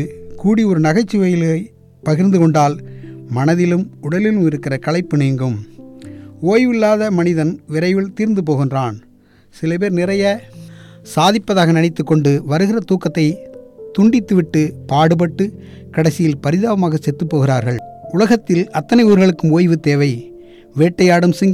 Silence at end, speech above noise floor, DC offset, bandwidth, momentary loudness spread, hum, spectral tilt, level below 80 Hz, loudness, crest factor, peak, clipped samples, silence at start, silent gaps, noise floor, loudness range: 0 s; 23 dB; under 0.1%; 14 kHz; 12 LU; none; -7 dB/octave; -50 dBFS; -15 LUFS; 12 dB; -2 dBFS; under 0.1%; 0 s; none; -37 dBFS; 3 LU